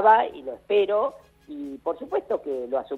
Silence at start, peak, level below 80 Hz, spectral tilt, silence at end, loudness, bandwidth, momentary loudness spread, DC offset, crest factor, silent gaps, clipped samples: 0 s; -6 dBFS; -64 dBFS; -5.5 dB/octave; 0 s; -25 LUFS; 4.4 kHz; 16 LU; under 0.1%; 18 dB; none; under 0.1%